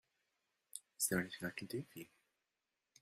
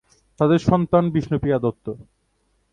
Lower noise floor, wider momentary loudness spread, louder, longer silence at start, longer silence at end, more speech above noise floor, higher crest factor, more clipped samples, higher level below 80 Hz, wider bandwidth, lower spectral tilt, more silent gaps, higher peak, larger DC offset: first, -90 dBFS vs -67 dBFS; about the same, 17 LU vs 16 LU; second, -41 LUFS vs -20 LUFS; first, 0.75 s vs 0.4 s; first, 0.95 s vs 0.7 s; about the same, 46 dB vs 47 dB; first, 24 dB vs 18 dB; neither; second, -76 dBFS vs -46 dBFS; first, 16 kHz vs 7.4 kHz; second, -3.5 dB/octave vs -8.5 dB/octave; neither; second, -22 dBFS vs -2 dBFS; neither